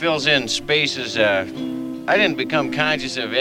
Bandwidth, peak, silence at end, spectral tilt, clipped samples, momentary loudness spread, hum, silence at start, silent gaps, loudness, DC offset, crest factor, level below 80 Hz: 16.5 kHz; -2 dBFS; 0 s; -3.5 dB/octave; under 0.1%; 10 LU; none; 0 s; none; -19 LUFS; under 0.1%; 18 dB; -52 dBFS